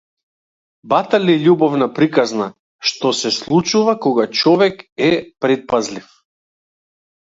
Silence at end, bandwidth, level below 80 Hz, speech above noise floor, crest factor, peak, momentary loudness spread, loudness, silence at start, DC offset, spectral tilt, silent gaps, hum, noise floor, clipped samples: 1.2 s; 7.8 kHz; -60 dBFS; over 75 dB; 16 dB; 0 dBFS; 7 LU; -16 LUFS; 0.85 s; under 0.1%; -5 dB/octave; 2.59-2.79 s, 4.92-4.96 s; none; under -90 dBFS; under 0.1%